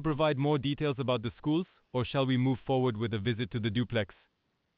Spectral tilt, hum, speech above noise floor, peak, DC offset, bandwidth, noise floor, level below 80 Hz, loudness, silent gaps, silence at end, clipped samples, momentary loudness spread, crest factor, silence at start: -5.5 dB/octave; none; 48 dB; -16 dBFS; under 0.1%; 5 kHz; -78 dBFS; -58 dBFS; -31 LUFS; none; 0.7 s; under 0.1%; 5 LU; 14 dB; 0 s